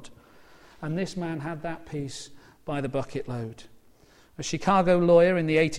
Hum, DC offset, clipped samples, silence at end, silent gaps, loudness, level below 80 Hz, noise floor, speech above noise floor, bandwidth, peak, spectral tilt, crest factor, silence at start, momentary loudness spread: none; under 0.1%; under 0.1%; 0 s; none; -26 LUFS; -54 dBFS; -57 dBFS; 31 dB; 11.5 kHz; -8 dBFS; -6 dB/octave; 20 dB; 0 s; 19 LU